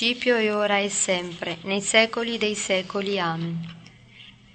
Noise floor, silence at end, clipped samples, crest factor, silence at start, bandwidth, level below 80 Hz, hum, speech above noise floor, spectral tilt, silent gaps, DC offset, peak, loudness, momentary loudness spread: -49 dBFS; 0.25 s; under 0.1%; 22 dB; 0 s; 9.2 kHz; -62 dBFS; none; 25 dB; -3 dB/octave; none; under 0.1%; -4 dBFS; -23 LUFS; 12 LU